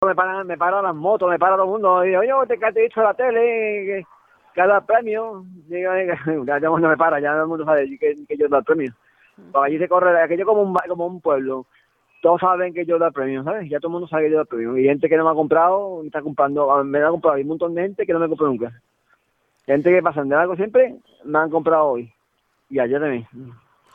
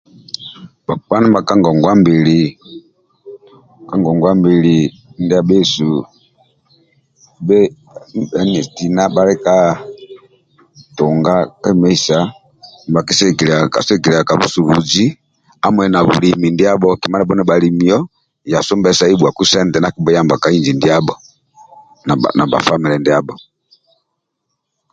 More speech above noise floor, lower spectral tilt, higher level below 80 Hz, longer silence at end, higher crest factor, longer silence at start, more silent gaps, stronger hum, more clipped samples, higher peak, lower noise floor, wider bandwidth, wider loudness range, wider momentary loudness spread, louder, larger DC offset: second, 49 dB vs 60 dB; first, -9 dB/octave vs -5.5 dB/octave; second, -64 dBFS vs -48 dBFS; second, 0.4 s vs 1.55 s; about the same, 16 dB vs 14 dB; second, 0 s vs 0.4 s; neither; neither; neither; about the same, -2 dBFS vs 0 dBFS; second, -68 dBFS vs -72 dBFS; second, 3.9 kHz vs 9 kHz; about the same, 3 LU vs 4 LU; second, 9 LU vs 12 LU; second, -19 LUFS vs -13 LUFS; neither